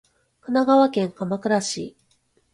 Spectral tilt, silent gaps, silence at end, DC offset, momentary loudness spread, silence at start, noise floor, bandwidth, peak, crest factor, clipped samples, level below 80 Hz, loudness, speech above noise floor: -5 dB/octave; none; 0.65 s; under 0.1%; 16 LU; 0.5 s; -65 dBFS; 11.5 kHz; -6 dBFS; 16 dB; under 0.1%; -66 dBFS; -21 LUFS; 44 dB